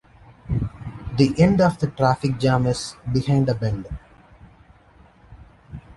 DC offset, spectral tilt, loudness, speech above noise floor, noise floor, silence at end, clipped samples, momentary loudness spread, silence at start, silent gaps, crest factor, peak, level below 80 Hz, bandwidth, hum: under 0.1%; -7 dB/octave; -21 LUFS; 32 dB; -52 dBFS; 0.05 s; under 0.1%; 19 LU; 0.45 s; none; 20 dB; -2 dBFS; -42 dBFS; 11.5 kHz; none